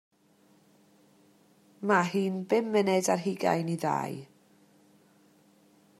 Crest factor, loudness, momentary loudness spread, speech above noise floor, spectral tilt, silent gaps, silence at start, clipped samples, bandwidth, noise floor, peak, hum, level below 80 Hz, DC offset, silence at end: 22 dB; -28 LUFS; 9 LU; 36 dB; -5.5 dB/octave; none; 1.8 s; under 0.1%; 14 kHz; -64 dBFS; -10 dBFS; none; -82 dBFS; under 0.1%; 1.75 s